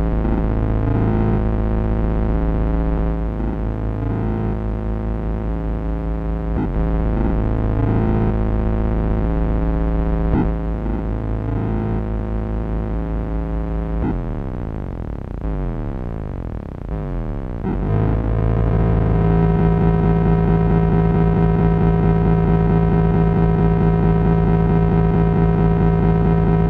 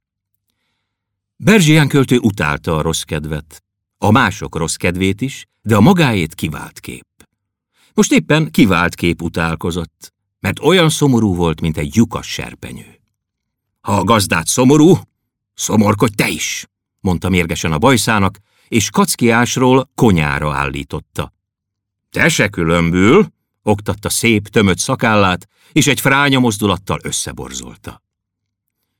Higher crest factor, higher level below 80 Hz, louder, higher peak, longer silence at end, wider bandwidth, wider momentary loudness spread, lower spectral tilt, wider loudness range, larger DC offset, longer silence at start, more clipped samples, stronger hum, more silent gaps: about the same, 14 dB vs 16 dB; first, -22 dBFS vs -42 dBFS; second, -19 LUFS vs -14 LUFS; about the same, -2 dBFS vs 0 dBFS; second, 0 s vs 1.05 s; second, 4 kHz vs 18 kHz; second, 10 LU vs 14 LU; first, -11.5 dB/octave vs -5 dB/octave; first, 9 LU vs 3 LU; neither; second, 0 s vs 1.4 s; neither; neither; neither